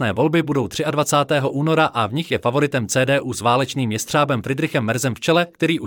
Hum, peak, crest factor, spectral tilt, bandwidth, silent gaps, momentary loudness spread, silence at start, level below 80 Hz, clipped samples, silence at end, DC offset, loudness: none; -4 dBFS; 16 dB; -5 dB/octave; 19 kHz; none; 4 LU; 0 s; -58 dBFS; under 0.1%; 0 s; under 0.1%; -19 LUFS